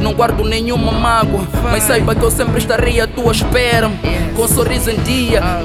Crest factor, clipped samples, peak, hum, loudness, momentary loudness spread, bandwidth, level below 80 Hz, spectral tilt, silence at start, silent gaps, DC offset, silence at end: 14 dB; under 0.1%; 0 dBFS; none; -14 LUFS; 4 LU; 16.5 kHz; -22 dBFS; -4.5 dB/octave; 0 s; none; under 0.1%; 0 s